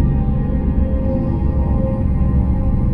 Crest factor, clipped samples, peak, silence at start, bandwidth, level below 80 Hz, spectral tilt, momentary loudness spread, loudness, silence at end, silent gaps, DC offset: 12 dB; under 0.1%; -4 dBFS; 0 s; 3 kHz; -18 dBFS; -12 dB/octave; 2 LU; -18 LUFS; 0 s; none; under 0.1%